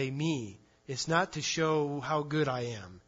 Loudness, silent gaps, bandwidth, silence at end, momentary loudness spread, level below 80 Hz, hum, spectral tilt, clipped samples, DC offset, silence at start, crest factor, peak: -32 LUFS; none; 7.8 kHz; 0.1 s; 9 LU; -66 dBFS; none; -4.5 dB/octave; under 0.1%; under 0.1%; 0 s; 20 dB; -14 dBFS